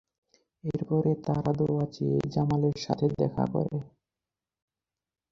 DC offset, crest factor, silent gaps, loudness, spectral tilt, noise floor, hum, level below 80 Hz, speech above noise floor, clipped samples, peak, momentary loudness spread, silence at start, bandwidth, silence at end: under 0.1%; 20 dB; none; -29 LUFS; -8.5 dB/octave; under -90 dBFS; none; -58 dBFS; over 62 dB; under 0.1%; -8 dBFS; 7 LU; 0.65 s; 7.4 kHz; 1.45 s